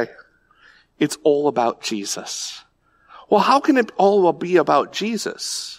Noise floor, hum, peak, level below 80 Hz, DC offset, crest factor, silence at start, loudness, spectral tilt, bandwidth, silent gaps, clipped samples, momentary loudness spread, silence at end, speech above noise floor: -54 dBFS; none; -4 dBFS; -68 dBFS; under 0.1%; 16 dB; 0 s; -19 LUFS; -4 dB/octave; 16 kHz; none; under 0.1%; 11 LU; 0.05 s; 35 dB